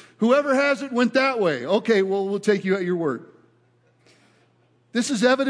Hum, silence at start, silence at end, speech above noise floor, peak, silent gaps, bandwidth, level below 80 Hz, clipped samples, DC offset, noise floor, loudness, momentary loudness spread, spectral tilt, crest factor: none; 0.2 s; 0 s; 41 dB; -6 dBFS; none; 10.5 kHz; -80 dBFS; under 0.1%; under 0.1%; -61 dBFS; -22 LUFS; 7 LU; -5 dB/octave; 16 dB